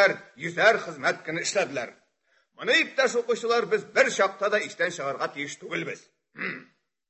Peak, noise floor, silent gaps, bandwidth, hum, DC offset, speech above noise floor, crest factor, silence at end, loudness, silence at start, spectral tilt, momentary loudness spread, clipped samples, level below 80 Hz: -4 dBFS; -69 dBFS; none; 8.4 kHz; none; under 0.1%; 43 dB; 22 dB; 0.45 s; -26 LUFS; 0 s; -2.5 dB/octave; 13 LU; under 0.1%; -80 dBFS